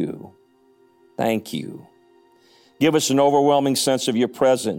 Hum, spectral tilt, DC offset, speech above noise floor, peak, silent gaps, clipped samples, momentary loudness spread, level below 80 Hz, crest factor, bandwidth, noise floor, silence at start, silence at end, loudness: none; -4.5 dB/octave; under 0.1%; 38 dB; -6 dBFS; none; under 0.1%; 15 LU; -66 dBFS; 16 dB; 17 kHz; -57 dBFS; 0 s; 0 s; -20 LUFS